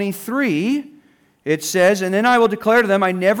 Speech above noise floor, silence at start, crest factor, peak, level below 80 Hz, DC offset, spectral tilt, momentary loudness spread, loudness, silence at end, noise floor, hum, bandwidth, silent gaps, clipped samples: 37 dB; 0 s; 12 dB; -6 dBFS; -64 dBFS; under 0.1%; -4.5 dB/octave; 8 LU; -17 LUFS; 0 s; -54 dBFS; none; over 20 kHz; none; under 0.1%